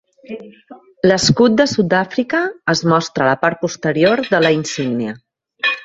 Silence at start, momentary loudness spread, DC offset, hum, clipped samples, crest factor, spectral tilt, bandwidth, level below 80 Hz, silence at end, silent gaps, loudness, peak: 0.3 s; 14 LU; under 0.1%; none; under 0.1%; 16 dB; -4.5 dB/octave; 8.2 kHz; -52 dBFS; 0 s; none; -16 LUFS; 0 dBFS